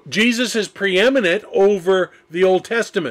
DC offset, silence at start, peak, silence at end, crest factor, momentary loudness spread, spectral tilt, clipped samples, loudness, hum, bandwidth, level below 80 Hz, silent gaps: under 0.1%; 0.05 s; -8 dBFS; 0 s; 10 dB; 5 LU; -4 dB/octave; under 0.1%; -17 LUFS; none; 14.5 kHz; -60 dBFS; none